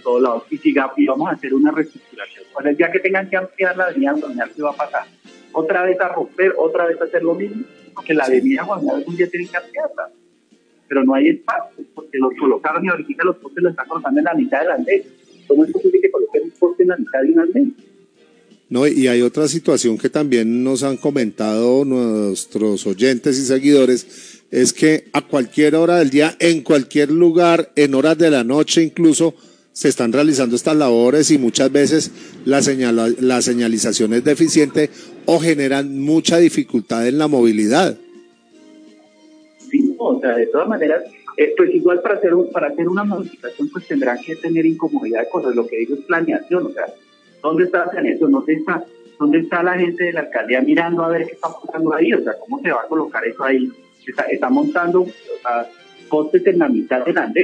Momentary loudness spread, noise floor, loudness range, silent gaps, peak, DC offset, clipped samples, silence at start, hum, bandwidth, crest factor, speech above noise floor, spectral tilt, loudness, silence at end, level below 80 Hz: 10 LU; -55 dBFS; 5 LU; none; 0 dBFS; under 0.1%; under 0.1%; 0.05 s; none; 10.5 kHz; 16 dB; 39 dB; -4.5 dB/octave; -17 LUFS; 0 s; -70 dBFS